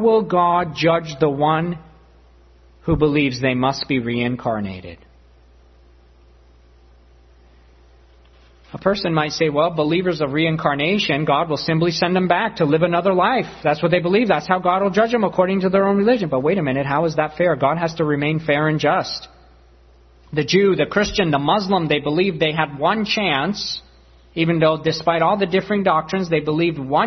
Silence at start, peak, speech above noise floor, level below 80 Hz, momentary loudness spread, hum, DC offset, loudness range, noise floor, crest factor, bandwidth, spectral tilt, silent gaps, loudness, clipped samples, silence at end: 0 s; 0 dBFS; 31 dB; -48 dBFS; 6 LU; none; under 0.1%; 6 LU; -50 dBFS; 20 dB; 6.4 kHz; -6 dB/octave; none; -19 LUFS; under 0.1%; 0 s